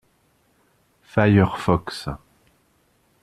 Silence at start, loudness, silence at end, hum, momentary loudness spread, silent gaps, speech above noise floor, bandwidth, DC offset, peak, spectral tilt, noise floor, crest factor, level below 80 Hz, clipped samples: 1.15 s; -21 LUFS; 1.05 s; none; 16 LU; none; 44 dB; 12.5 kHz; under 0.1%; -2 dBFS; -7.5 dB/octave; -63 dBFS; 22 dB; -48 dBFS; under 0.1%